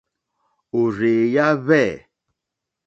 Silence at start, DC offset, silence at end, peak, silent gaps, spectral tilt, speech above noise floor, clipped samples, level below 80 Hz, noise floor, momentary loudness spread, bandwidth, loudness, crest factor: 0.75 s; under 0.1%; 0.9 s; -2 dBFS; none; -7 dB/octave; 65 dB; under 0.1%; -60 dBFS; -83 dBFS; 9 LU; 7.6 kHz; -19 LUFS; 18 dB